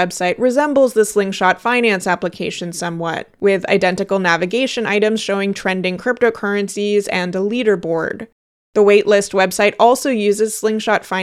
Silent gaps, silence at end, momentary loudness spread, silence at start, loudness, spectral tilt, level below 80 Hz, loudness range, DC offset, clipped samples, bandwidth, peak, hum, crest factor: 8.32-8.73 s; 0 s; 9 LU; 0 s; -16 LUFS; -4.5 dB/octave; -58 dBFS; 3 LU; under 0.1%; under 0.1%; 14.5 kHz; 0 dBFS; none; 16 dB